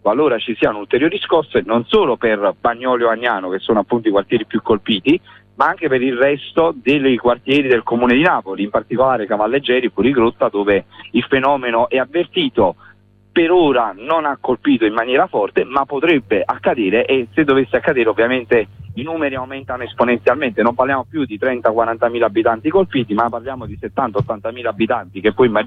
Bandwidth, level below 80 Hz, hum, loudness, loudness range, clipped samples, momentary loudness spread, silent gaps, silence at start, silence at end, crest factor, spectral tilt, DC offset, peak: 5.4 kHz; -48 dBFS; none; -16 LUFS; 2 LU; under 0.1%; 6 LU; none; 0.05 s; 0 s; 14 dB; -8 dB/octave; under 0.1%; -2 dBFS